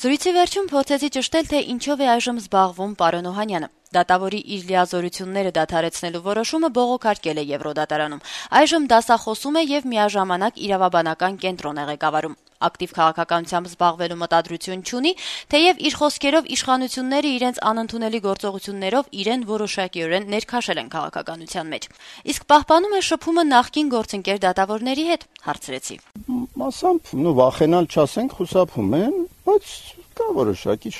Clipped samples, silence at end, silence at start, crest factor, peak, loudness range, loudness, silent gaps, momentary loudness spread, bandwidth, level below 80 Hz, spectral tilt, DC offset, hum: under 0.1%; 0 s; 0 s; 20 dB; -2 dBFS; 4 LU; -21 LUFS; none; 11 LU; 13.5 kHz; -54 dBFS; -4 dB/octave; under 0.1%; none